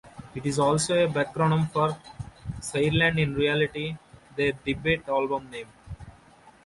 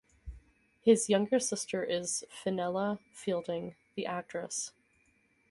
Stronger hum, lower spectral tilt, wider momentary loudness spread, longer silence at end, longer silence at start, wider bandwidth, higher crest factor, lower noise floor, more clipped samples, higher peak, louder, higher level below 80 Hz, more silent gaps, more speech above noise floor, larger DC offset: neither; about the same, -5 dB/octave vs -4 dB/octave; first, 18 LU vs 15 LU; second, 0.55 s vs 0.8 s; second, 0.05 s vs 0.25 s; about the same, 11.5 kHz vs 11.5 kHz; about the same, 18 dB vs 22 dB; second, -54 dBFS vs -70 dBFS; neither; about the same, -10 dBFS vs -12 dBFS; first, -25 LUFS vs -33 LUFS; first, -50 dBFS vs -60 dBFS; neither; second, 29 dB vs 38 dB; neither